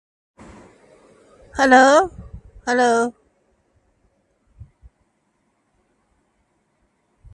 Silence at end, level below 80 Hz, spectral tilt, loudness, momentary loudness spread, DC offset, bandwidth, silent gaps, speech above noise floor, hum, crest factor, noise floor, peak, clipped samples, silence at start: 4.25 s; -50 dBFS; -3.5 dB/octave; -16 LUFS; 23 LU; under 0.1%; 11.5 kHz; none; 53 dB; none; 22 dB; -67 dBFS; 0 dBFS; under 0.1%; 1.55 s